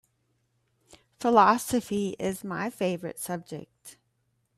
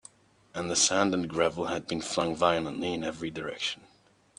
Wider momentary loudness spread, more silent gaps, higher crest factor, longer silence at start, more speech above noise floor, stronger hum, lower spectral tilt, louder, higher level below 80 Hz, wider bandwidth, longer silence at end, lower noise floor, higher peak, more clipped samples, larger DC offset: first, 15 LU vs 12 LU; neither; about the same, 22 dB vs 22 dB; first, 1.2 s vs 0.55 s; first, 47 dB vs 30 dB; neither; first, -5 dB/octave vs -3 dB/octave; about the same, -27 LUFS vs -29 LUFS; about the same, -66 dBFS vs -62 dBFS; first, 16 kHz vs 10.5 kHz; about the same, 0.65 s vs 0.65 s; first, -74 dBFS vs -59 dBFS; about the same, -6 dBFS vs -8 dBFS; neither; neither